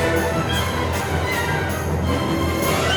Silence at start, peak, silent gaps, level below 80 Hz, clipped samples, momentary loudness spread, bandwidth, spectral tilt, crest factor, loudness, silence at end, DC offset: 0 s; -6 dBFS; none; -34 dBFS; under 0.1%; 3 LU; over 20 kHz; -5 dB/octave; 14 dB; -21 LUFS; 0 s; under 0.1%